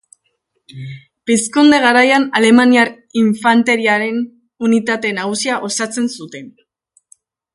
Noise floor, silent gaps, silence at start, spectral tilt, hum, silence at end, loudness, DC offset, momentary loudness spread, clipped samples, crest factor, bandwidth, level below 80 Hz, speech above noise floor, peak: -67 dBFS; none; 0.75 s; -3.5 dB/octave; none; 1.05 s; -13 LUFS; under 0.1%; 20 LU; under 0.1%; 16 dB; 11.5 kHz; -62 dBFS; 54 dB; 0 dBFS